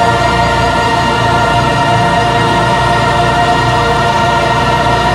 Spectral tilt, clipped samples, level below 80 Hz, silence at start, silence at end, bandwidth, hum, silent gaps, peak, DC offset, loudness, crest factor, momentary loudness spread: -5 dB/octave; under 0.1%; -26 dBFS; 0 s; 0 s; 15.5 kHz; none; none; 0 dBFS; under 0.1%; -10 LUFS; 10 dB; 1 LU